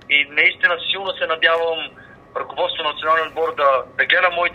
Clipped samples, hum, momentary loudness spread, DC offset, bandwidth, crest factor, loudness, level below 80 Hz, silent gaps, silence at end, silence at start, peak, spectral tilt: under 0.1%; none; 12 LU; under 0.1%; 7 kHz; 18 dB; -18 LUFS; -58 dBFS; none; 0 s; 0.1 s; -2 dBFS; -3.5 dB/octave